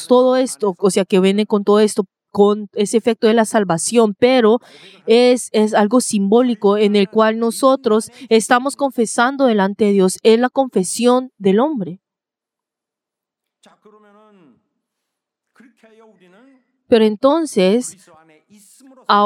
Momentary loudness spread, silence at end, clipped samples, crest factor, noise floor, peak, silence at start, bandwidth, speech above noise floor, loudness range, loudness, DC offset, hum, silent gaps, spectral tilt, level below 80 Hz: 6 LU; 0 s; under 0.1%; 16 dB; -86 dBFS; 0 dBFS; 0 s; 15.5 kHz; 71 dB; 6 LU; -15 LUFS; under 0.1%; none; none; -5 dB/octave; -68 dBFS